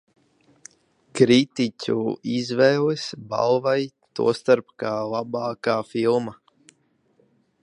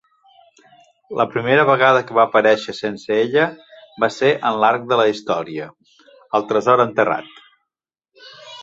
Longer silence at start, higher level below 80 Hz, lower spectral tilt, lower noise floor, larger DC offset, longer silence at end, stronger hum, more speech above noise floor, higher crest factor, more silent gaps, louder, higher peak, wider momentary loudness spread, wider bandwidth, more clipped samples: about the same, 1.15 s vs 1.1 s; about the same, -68 dBFS vs -64 dBFS; about the same, -5.5 dB/octave vs -5.5 dB/octave; second, -64 dBFS vs -85 dBFS; neither; first, 1.3 s vs 0 s; neither; second, 42 dB vs 68 dB; about the same, 22 dB vs 18 dB; neither; second, -22 LUFS vs -17 LUFS; about the same, -2 dBFS vs 0 dBFS; about the same, 10 LU vs 12 LU; first, 11 kHz vs 7.8 kHz; neither